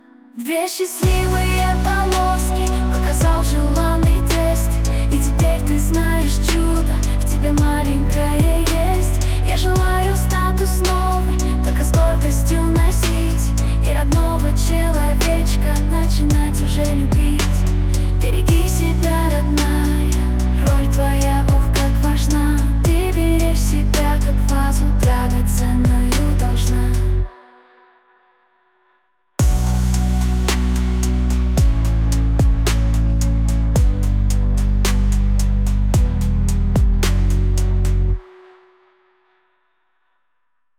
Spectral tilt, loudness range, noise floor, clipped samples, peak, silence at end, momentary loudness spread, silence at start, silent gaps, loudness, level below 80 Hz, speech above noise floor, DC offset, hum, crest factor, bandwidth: -5.5 dB/octave; 3 LU; -74 dBFS; under 0.1%; -6 dBFS; 2.55 s; 3 LU; 0.35 s; none; -18 LUFS; -18 dBFS; 59 dB; under 0.1%; none; 10 dB; 16.5 kHz